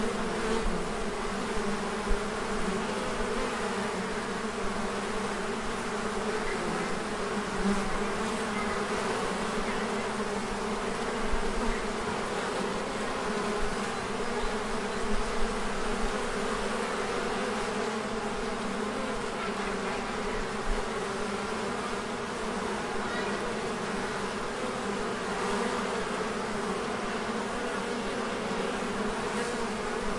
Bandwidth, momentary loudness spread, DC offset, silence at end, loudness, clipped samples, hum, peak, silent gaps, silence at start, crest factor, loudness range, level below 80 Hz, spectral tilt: 11.5 kHz; 2 LU; under 0.1%; 0 s; -32 LUFS; under 0.1%; none; -14 dBFS; none; 0 s; 16 dB; 2 LU; -42 dBFS; -4 dB/octave